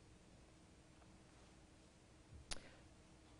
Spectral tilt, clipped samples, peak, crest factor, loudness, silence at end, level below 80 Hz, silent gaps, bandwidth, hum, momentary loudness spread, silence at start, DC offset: -3 dB/octave; under 0.1%; -28 dBFS; 32 dB; -61 LUFS; 0 s; -66 dBFS; none; 10 kHz; none; 14 LU; 0 s; under 0.1%